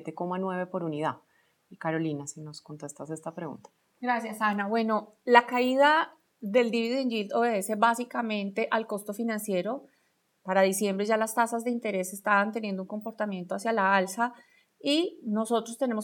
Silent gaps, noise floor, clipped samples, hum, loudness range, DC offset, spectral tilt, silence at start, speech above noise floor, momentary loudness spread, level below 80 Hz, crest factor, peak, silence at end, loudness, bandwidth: none; -72 dBFS; under 0.1%; none; 9 LU; under 0.1%; -4.5 dB/octave; 0 s; 44 dB; 15 LU; -88 dBFS; 26 dB; -2 dBFS; 0 s; -28 LUFS; 18.5 kHz